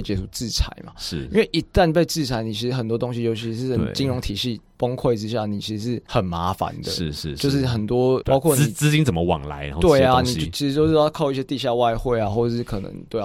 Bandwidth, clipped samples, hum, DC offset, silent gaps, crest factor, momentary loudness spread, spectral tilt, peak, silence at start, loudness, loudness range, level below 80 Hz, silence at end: 16.5 kHz; under 0.1%; none; under 0.1%; none; 18 dB; 9 LU; -5.5 dB/octave; -4 dBFS; 0 s; -22 LUFS; 5 LU; -36 dBFS; 0 s